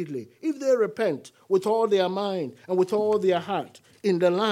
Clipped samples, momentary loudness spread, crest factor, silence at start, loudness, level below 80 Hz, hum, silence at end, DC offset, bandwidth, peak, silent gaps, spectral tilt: under 0.1%; 9 LU; 14 dB; 0 s; -25 LUFS; -82 dBFS; none; 0 s; under 0.1%; 13.5 kHz; -10 dBFS; none; -6 dB/octave